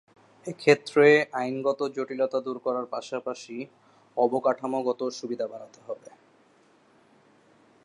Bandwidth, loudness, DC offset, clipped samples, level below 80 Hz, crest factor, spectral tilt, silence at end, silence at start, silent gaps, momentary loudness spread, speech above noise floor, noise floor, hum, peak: 11 kHz; -26 LUFS; under 0.1%; under 0.1%; -84 dBFS; 22 dB; -5 dB/octave; 1.9 s; 0.45 s; none; 21 LU; 35 dB; -61 dBFS; none; -6 dBFS